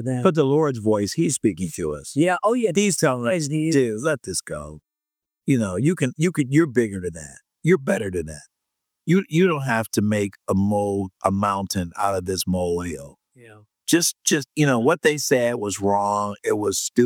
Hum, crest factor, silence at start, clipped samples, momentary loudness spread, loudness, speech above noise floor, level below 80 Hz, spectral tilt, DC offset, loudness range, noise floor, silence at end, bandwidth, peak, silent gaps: none; 20 dB; 0 s; under 0.1%; 9 LU; -22 LUFS; 67 dB; -54 dBFS; -5 dB/octave; under 0.1%; 3 LU; -88 dBFS; 0 s; 19 kHz; -2 dBFS; none